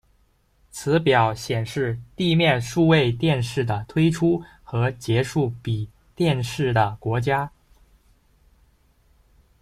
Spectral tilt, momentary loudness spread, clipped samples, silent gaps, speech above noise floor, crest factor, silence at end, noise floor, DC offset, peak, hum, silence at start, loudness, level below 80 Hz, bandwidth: -6 dB/octave; 10 LU; under 0.1%; none; 41 dB; 18 dB; 2.15 s; -62 dBFS; under 0.1%; -4 dBFS; none; 0.75 s; -22 LUFS; -50 dBFS; 14.5 kHz